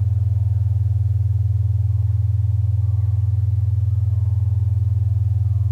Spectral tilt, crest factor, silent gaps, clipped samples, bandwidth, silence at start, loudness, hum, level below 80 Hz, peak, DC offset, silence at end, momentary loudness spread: -10.5 dB/octave; 6 dB; none; under 0.1%; 1.2 kHz; 0 s; -20 LUFS; none; -34 dBFS; -12 dBFS; under 0.1%; 0 s; 0 LU